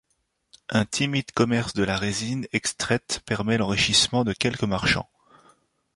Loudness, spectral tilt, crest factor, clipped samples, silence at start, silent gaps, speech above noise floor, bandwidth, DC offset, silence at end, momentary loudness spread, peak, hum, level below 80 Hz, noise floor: -24 LUFS; -4 dB/octave; 20 dB; under 0.1%; 0.7 s; none; 49 dB; 11.5 kHz; under 0.1%; 0.95 s; 8 LU; -6 dBFS; none; -48 dBFS; -73 dBFS